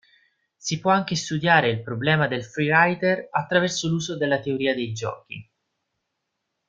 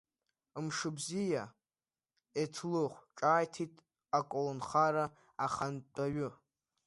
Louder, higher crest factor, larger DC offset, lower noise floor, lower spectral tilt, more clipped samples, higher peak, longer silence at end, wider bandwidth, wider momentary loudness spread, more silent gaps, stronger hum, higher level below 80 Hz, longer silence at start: first, -22 LUFS vs -36 LUFS; about the same, 22 dB vs 20 dB; neither; second, -79 dBFS vs under -90 dBFS; about the same, -4.5 dB/octave vs -5 dB/octave; neither; first, -2 dBFS vs -18 dBFS; first, 1.25 s vs 0.5 s; second, 9 kHz vs 11.5 kHz; about the same, 13 LU vs 12 LU; neither; neither; first, -62 dBFS vs -74 dBFS; about the same, 0.65 s vs 0.55 s